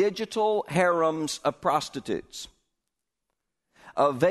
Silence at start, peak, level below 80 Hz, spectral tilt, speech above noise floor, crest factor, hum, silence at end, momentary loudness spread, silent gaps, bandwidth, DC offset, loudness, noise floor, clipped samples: 0 s; -10 dBFS; -64 dBFS; -4.5 dB/octave; 59 dB; 18 dB; none; 0 s; 14 LU; none; 12.5 kHz; under 0.1%; -26 LUFS; -85 dBFS; under 0.1%